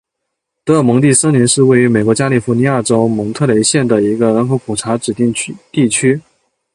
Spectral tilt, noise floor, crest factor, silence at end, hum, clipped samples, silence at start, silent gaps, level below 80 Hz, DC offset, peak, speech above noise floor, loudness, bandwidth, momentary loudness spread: -5 dB/octave; -75 dBFS; 12 dB; 0.55 s; none; under 0.1%; 0.65 s; none; -50 dBFS; under 0.1%; 0 dBFS; 63 dB; -12 LUFS; 11.5 kHz; 8 LU